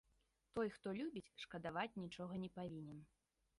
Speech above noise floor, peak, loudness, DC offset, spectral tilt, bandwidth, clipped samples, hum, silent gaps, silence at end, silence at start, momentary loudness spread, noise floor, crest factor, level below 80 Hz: 34 dB; -30 dBFS; -48 LUFS; under 0.1%; -6.5 dB/octave; 11 kHz; under 0.1%; none; none; 0.55 s; 0.55 s; 8 LU; -82 dBFS; 20 dB; -76 dBFS